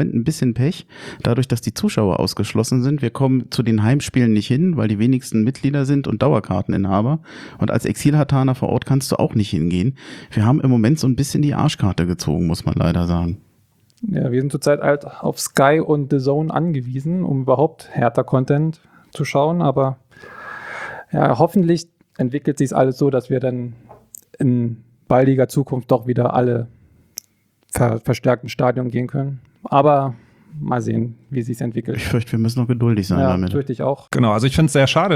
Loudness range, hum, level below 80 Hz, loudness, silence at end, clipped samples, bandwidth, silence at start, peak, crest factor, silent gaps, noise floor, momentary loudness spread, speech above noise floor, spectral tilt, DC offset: 3 LU; none; -48 dBFS; -19 LUFS; 0 s; under 0.1%; 15.5 kHz; 0 s; 0 dBFS; 18 dB; none; -60 dBFS; 10 LU; 43 dB; -7 dB/octave; under 0.1%